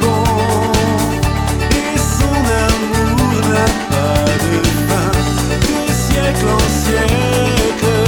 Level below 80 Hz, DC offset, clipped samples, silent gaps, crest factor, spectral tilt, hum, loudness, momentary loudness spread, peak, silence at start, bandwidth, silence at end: -22 dBFS; under 0.1%; under 0.1%; none; 12 dB; -5 dB/octave; none; -14 LUFS; 2 LU; -2 dBFS; 0 s; 20 kHz; 0 s